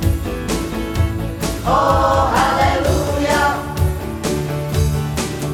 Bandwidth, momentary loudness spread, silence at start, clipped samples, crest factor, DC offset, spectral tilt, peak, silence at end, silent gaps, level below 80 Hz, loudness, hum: 17 kHz; 7 LU; 0 s; under 0.1%; 14 dB; under 0.1%; -5.5 dB/octave; -2 dBFS; 0 s; none; -26 dBFS; -18 LUFS; none